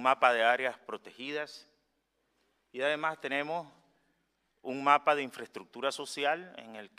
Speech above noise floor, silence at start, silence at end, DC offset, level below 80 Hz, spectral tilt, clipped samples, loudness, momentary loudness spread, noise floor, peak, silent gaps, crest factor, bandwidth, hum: 47 dB; 0 s; 0.1 s; under 0.1%; -86 dBFS; -3 dB/octave; under 0.1%; -31 LUFS; 20 LU; -78 dBFS; -8 dBFS; none; 24 dB; 15 kHz; none